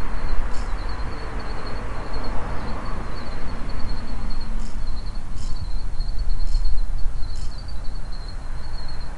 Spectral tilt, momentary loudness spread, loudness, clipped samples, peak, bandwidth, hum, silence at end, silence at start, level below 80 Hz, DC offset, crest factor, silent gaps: -5.5 dB/octave; 5 LU; -32 LUFS; under 0.1%; -4 dBFS; 7.8 kHz; none; 0 s; 0 s; -24 dBFS; under 0.1%; 12 dB; none